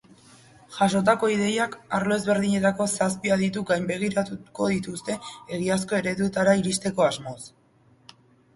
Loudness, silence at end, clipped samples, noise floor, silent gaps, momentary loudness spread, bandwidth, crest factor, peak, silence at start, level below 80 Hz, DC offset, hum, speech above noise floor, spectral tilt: -24 LUFS; 1.05 s; under 0.1%; -59 dBFS; none; 12 LU; 11.5 kHz; 18 dB; -6 dBFS; 0.7 s; -60 dBFS; under 0.1%; none; 35 dB; -5 dB/octave